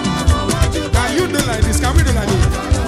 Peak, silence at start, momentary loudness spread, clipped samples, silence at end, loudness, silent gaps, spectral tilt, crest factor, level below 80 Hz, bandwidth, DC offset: 0 dBFS; 0 s; 2 LU; under 0.1%; 0 s; -16 LUFS; none; -5 dB/octave; 14 dB; -20 dBFS; 15.5 kHz; under 0.1%